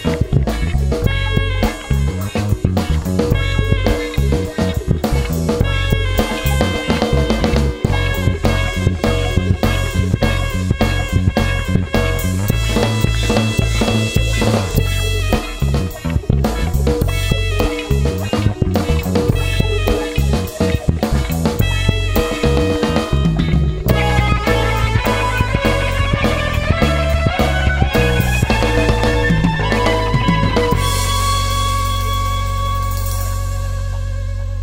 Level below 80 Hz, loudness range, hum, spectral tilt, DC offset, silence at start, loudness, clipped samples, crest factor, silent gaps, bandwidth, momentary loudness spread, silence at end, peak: -20 dBFS; 3 LU; none; -5.5 dB/octave; under 0.1%; 0 s; -17 LUFS; under 0.1%; 14 dB; none; 16.5 kHz; 4 LU; 0 s; 0 dBFS